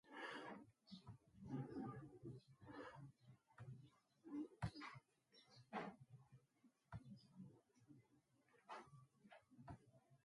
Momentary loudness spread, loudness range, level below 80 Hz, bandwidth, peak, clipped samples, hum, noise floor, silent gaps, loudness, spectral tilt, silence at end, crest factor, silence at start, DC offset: 15 LU; 8 LU; -76 dBFS; 11 kHz; -34 dBFS; under 0.1%; none; -80 dBFS; none; -57 LUFS; -6.5 dB/octave; 0.1 s; 24 dB; 0.05 s; under 0.1%